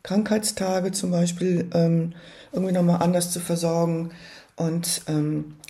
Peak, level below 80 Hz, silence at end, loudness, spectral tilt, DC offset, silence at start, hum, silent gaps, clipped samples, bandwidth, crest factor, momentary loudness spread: -8 dBFS; -60 dBFS; 0.15 s; -24 LUFS; -5.5 dB/octave; under 0.1%; 0.05 s; none; none; under 0.1%; 13.5 kHz; 16 dB; 11 LU